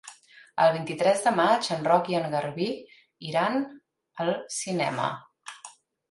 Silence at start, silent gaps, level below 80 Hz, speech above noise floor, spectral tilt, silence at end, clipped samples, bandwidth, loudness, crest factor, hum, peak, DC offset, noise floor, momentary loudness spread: 0.05 s; none; -74 dBFS; 25 dB; -4.5 dB/octave; 0.4 s; under 0.1%; 11.5 kHz; -26 LUFS; 18 dB; none; -8 dBFS; under 0.1%; -51 dBFS; 20 LU